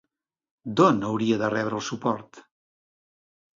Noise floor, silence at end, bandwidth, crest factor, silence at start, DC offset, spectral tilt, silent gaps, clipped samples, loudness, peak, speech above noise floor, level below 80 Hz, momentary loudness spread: under -90 dBFS; 1.2 s; 7.6 kHz; 22 dB; 0.65 s; under 0.1%; -6 dB/octave; none; under 0.1%; -24 LUFS; -4 dBFS; over 66 dB; -66 dBFS; 11 LU